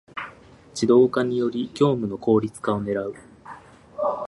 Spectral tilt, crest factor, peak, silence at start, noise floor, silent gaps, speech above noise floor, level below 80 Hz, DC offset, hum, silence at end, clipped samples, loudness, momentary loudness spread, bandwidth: -6.5 dB/octave; 18 dB; -6 dBFS; 0.15 s; -47 dBFS; none; 26 dB; -58 dBFS; under 0.1%; none; 0 s; under 0.1%; -22 LUFS; 24 LU; 11.5 kHz